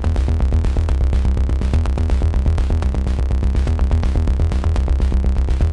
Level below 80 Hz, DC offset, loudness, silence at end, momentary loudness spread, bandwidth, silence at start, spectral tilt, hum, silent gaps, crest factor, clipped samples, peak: -16 dBFS; under 0.1%; -19 LUFS; 0 s; 1 LU; 9.2 kHz; 0 s; -8 dB/octave; none; none; 10 dB; under 0.1%; -6 dBFS